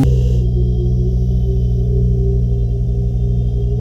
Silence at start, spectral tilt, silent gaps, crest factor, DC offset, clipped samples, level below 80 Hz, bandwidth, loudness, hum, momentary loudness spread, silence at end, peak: 0 s; -10 dB/octave; none; 10 dB; under 0.1%; under 0.1%; -16 dBFS; 6.2 kHz; -17 LUFS; 60 Hz at -20 dBFS; 3 LU; 0 s; -4 dBFS